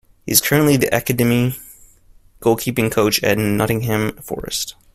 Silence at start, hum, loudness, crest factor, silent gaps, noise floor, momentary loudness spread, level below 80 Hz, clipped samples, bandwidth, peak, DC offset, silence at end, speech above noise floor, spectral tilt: 0.25 s; none; -17 LUFS; 18 dB; none; -49 dBFS; 9 LU; -44 dBFS; under 0.1%; 16 kHz; 0 dBFS; under 0.1%; 0.25 s; 31 dB; -4.5 dB/octave